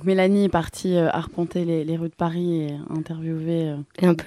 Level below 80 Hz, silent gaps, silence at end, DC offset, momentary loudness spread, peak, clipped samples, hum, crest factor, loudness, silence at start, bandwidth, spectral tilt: -52 dBFS; none; 0 s; under 0.1%; 10 LU; -6 dBFS; under 0.1%; none; 16 dB; -24 LUFS; 0 s; 13.5 kHz; -7.5 dB/octave